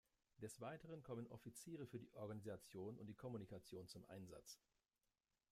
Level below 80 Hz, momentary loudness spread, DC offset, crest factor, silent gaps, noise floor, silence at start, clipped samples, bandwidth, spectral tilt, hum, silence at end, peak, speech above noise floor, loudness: -82 dBFS; 5 LU; under 0.1%; 16 dB; none; under -90 dBFS; 0.35 s; under 0.1%; 15.5 kHz; -5.5 dB/octave; none; 0.95 s; -40 dBFS; over 34 dB; -56 LUFS